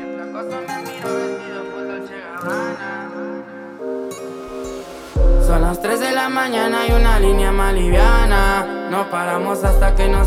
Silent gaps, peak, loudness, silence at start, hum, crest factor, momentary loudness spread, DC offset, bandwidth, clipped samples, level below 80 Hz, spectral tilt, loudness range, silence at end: none; -2 dBFS; -20 LUFS; 0 s; none; 16 dB; 14 LU; under 0.1%; 15 kHz; under 0.1%; -18 dBFS; -5.5 dB/octave; 10 LU; 0 s